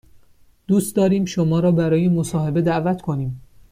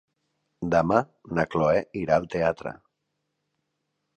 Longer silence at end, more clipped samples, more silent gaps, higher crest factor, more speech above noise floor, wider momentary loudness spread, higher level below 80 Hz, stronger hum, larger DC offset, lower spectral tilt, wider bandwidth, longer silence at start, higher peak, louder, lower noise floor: second, 0.3 s vs 1.45 s; neither; neither; second, 12 dB vs 22 dB; second, 34 dB vs 55 dB; second, 8 LU vs 12 LU; about the same, -50 dBFS vs -54 dBFS; neither; neither; about the same, -7 dB/octave vs -7.5 dB/octave; first, 15.5 kHz vs 9 kHz; about the same, 0.7 s vs 0.6 s; about the same, -8 dBFS vs -6 dBFS; first, -20 LUFS vs -25 LUFS; second, -52 dBFS vs -79 dBFS